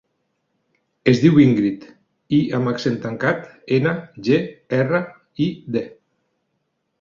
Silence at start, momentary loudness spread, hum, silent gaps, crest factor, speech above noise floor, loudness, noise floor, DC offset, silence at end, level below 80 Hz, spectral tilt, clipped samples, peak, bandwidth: 1.05 s; 12 LU; none; none; 18 dB; 54 dB; -19 LUFS; -72 dBFS; under 0.1%; 1.1 s; -58 dBFS; -7.5 dB/octave; under 0.1%; -2 dBFS; 7.2 kHz